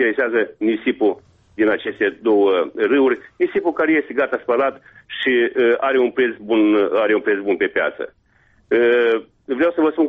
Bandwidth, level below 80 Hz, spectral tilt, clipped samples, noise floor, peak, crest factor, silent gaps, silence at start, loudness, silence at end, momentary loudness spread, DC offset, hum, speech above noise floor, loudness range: 4.5 kHz; -60 dBFS; -7 dB/octave; under 0.1%; -57 dBFS; -6 dBFS; 12 dB; none; 0 s; -18 LUFS; 0 s; 6 LU; under 0.1%; none; 39 dB; 1 LU